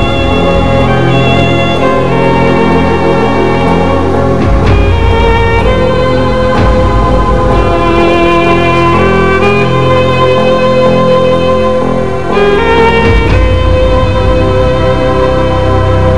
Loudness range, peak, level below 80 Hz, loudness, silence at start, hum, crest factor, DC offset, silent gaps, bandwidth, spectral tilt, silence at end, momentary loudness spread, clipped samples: 1 LU; 0 dBFS; -16 dBFS; -8 LUFS; 0 s; none; 8 dB; 10%; none; 11 kHz; -7 dB/octave; 0 s; 2 LU; 3%